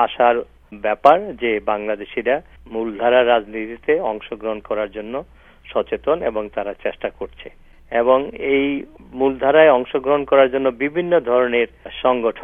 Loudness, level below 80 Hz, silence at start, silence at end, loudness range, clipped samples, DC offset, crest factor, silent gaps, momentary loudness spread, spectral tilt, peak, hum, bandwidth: -19 LUFS; -48 dBFS; 0 s; 0 s; 8 LU; under 0.1%; under 0.1%; 18 dB; none; 13 LU; -7 dB/octave; 0 dBFS; none; 4.8 kHz